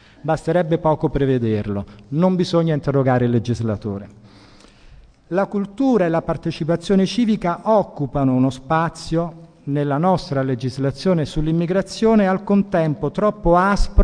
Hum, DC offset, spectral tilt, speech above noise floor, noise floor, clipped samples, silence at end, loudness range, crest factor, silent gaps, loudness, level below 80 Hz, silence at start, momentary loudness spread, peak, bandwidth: none; under 0.1%; -7.5 dB/octave; 28 dB; -47 dBFS; under 0.1%; 0 s; 3 LU; 18 dB; none; -19 LUFS; -32 dBFS; 0.25 s; 7 LU; 0 dBFS; 10 kHz